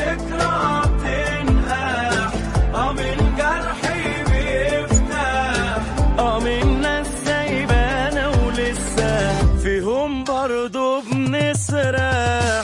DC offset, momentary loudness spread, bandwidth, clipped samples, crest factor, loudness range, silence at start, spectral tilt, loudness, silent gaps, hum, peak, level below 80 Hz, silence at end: under 0.1%; 3 LU; 11.5 kHz; under 0.1%; 16 dB; 1 LU; 0 s; -5 dB/octave; -20 LUFS; none; none; -4 dBFS; -24 dBFS; 0 s